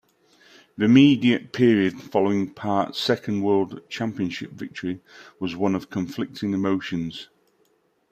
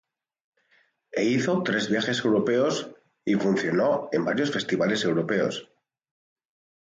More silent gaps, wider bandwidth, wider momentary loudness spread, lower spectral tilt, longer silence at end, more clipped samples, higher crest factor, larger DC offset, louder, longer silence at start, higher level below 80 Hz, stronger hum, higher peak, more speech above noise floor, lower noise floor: neither; first, 14 kHz vs 9.4 kHz; first, 15 LU vs 7 LU; first, -6.5 dB/octave vs -5 dB/octave; second, 0.85 s vs 1.2 s; neither; first, 20 dB vs 14 dB; neither; about the same, -23 LUFS vs -25 LUFS; second, 0.8 s vs 1.15 s; first, -64 dBFS vs -70 dBFS; neither; first, -4 dBFS vs -12 dBFS; about the same, 43 dB vs 41 dB; about the same, -66 dBFS vs -66 dBFS